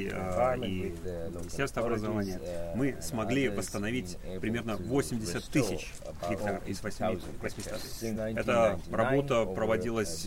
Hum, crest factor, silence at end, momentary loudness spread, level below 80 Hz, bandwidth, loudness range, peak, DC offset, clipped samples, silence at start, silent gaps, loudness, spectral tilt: none; 18 dB; 0 s; 10 LU; -46 dBFS; 16 kHz; 3 LU; -14 dBFS; under 0.1%; under 0.1%; 0 s; none; -32 LUFS; -5.5 dB/octave